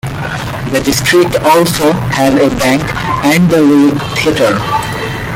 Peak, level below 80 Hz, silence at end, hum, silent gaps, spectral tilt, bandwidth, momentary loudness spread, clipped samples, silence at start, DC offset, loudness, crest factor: 0 dBFS; -32 dBFS; 0 s; none; none; -5 dB/octave; 17 kHz; 10 LU; under 0.1%; 0.05 s; under 0.1%; -11 LUFS; 10 dB